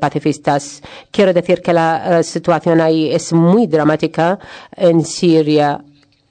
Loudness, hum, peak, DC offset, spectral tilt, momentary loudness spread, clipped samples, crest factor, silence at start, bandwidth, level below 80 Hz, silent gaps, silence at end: -14 LUFS; none; -2 dBFS; under 0.1%; -6 dB/octave; 9 LU; under 0.1%; 12 dB; 0 s; 9.4 kHz; -56 dBFS; none; 0.5 s